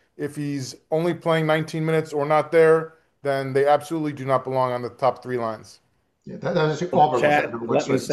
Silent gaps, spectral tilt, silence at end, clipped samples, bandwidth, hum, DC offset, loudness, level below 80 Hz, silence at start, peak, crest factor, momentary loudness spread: none; -6 dB/octave; 0 s; under 0.1%; 12.5 kHz; none; under 0.1%; -22 LUFS; -66 dBFS; 0.2 s; -4 dBFS; 18 dB; 12 LU